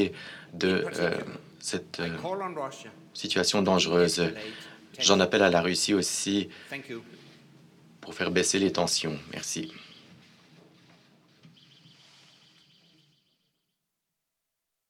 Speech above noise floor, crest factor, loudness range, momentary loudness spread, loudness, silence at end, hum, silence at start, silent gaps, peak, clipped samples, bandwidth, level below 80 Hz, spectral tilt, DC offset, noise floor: 56 dB; 26 dB; 8 LU; 20 LU; -27 LUFS; 4.75 s; none; 0 s; none; -4 dBFS; under 0.1%; 16 kHz; -70 dBFS; -3.5 dB/octave; under 0.1%; -84 dBFS